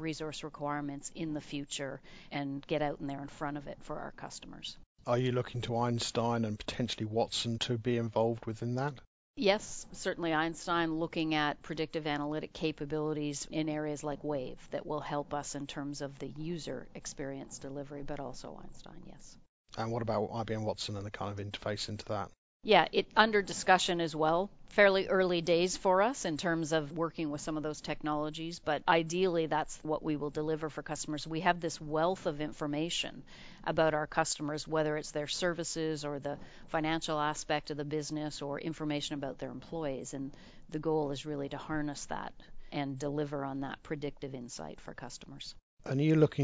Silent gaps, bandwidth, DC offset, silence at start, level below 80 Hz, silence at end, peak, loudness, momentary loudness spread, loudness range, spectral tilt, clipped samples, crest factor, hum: 4.86-4.95 s, 9.07-9.34 s, 19.49-19.65 s, 22.38-22.60 s, 45.62-45.77 s; 8 kHz; under 0.1%; 0 s; -58 dBFS; 0 s; -8 dBFS; -34 LUFS; 14 LU; 10 LU; -4.5 dB/octave; under 0.1%; 26 dB; none